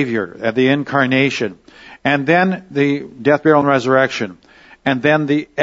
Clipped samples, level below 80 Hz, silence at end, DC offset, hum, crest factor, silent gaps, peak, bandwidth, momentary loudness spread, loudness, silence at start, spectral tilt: under 0.1%; -58 dBFS; 0 s; under 0.1%; none; 16 dB; none; 0 dBFS; 7.8 kHz; 10 LU; -16 LUFS; 0 s; -6.5 dB/octave